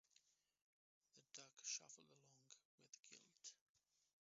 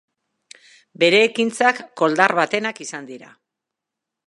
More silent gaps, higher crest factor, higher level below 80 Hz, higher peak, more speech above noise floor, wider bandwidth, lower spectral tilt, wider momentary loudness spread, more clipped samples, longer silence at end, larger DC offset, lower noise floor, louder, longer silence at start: first, 0.61-1.01 s, 2.65-2.78 s, 3.61-3.75 s vs none; about the same, 26 dB vs 22 dB; second, under -90 dBFS vs -74 dBFS; second, -36 dBFS vs 0 dBFS; second, 22 dB vs 65 dB; second, 7.6 kHz vs 11.5 kHz; second, 0 dB/octave vs -3.5 dB/octave; about the same, 18 LU vs 17 LU; neither; second, 0.45 s vs 1.05 s; neither; about the same, -82 dBFS vs -84 dBFS; second, -57 LUFS vs -18 LUFS; second, 0.15 s vs 1 s